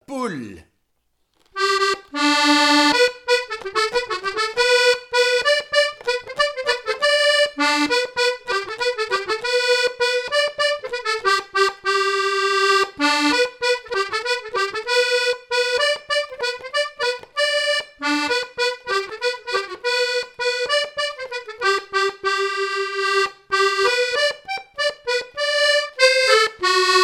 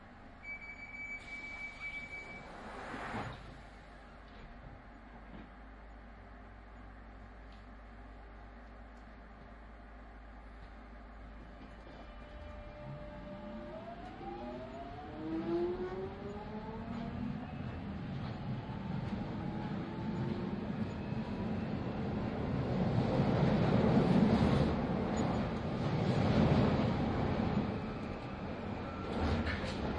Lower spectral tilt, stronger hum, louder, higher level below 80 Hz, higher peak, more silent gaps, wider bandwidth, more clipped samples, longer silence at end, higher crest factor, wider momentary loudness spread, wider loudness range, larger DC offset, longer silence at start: second, -1 dB/octave vs -8 dB/octave; neither; first, -19 LUFS vs -37 LUFS; second, -60 dBFS vs -50 dBFS; first, 0 dBFS vs -16 dBFS; neither; first, 16 kHz vs 10.5 kHz; neither; about the same, 0 s vs 0 s; about the same, 20 dB vs 20 dB; second, 9 LU vs 23 LU; second, 4 LU vs 22 LU; neither; about the same, 0.1 s vs 0 s